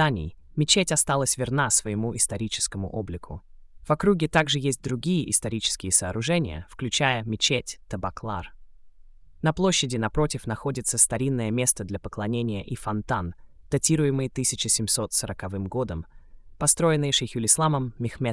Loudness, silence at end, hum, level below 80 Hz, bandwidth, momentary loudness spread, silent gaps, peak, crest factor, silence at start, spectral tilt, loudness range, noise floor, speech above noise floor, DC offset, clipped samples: -24 LUFS; 0 s; none; -46 dBFS; 12 kHz; 12 LU; none; -6 dBFS; 20 dB; 0 s; -3.5 dB/octave; 3 LU; -48 dBFS; 23 dB; under 0.1%; under 0.1%